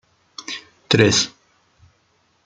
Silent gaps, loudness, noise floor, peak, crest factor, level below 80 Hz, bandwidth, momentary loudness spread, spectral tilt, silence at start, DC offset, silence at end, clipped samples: none; -18 LUFS; -63 dBFS; 0 dBFS; 22 dB; -54 dBFS; 9.6 kHz; 21 LU; -3.5 dB/octave; 0.4 s; under 0.1%; 1.15 s; under 0.1%